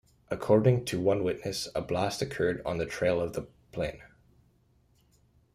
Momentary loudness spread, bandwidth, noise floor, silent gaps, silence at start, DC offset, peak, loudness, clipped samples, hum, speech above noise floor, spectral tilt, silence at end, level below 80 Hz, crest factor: 12 LU; 15.5 kHz; -66 dBFS; none; 0.3 s; under 0.1%; -10 dBFS; -30 LUFS; under 0.1%; none; 38 dB; -6 dB/octave; 1.5 s; -56 dBFS; 20 dB